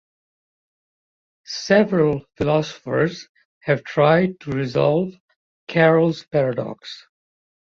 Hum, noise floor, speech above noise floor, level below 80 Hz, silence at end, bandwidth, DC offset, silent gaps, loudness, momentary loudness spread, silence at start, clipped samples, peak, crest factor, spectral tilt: none; under -90 dBFS; over 71 dB; -56 dBFS; 0.7 s; 7.4 kHz; under 0.1%; 3.29-3.35 s, 3.45-3.61 s, 5.20-5.28 s, 5.36-5.67 s; -20 LUFS; 16 LU; 1.5 s; under 0.1%; -2 dBFS; 20 dB; -6.5 dB/octave